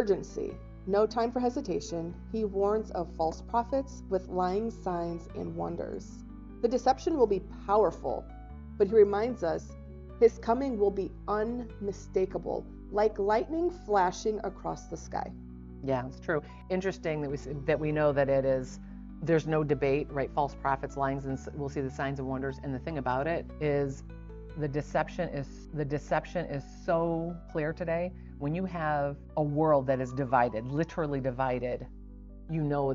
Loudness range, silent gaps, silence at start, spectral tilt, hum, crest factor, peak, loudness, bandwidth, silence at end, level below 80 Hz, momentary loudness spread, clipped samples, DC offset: 5 LU; none; 0 s; -6.5 dB/octave; none; 20 dB; -10 dBFS; -31 LUFS; 7.6 kHz; 0 s; -48 dBFS; 12 LU; under 0.1%; under 0.1%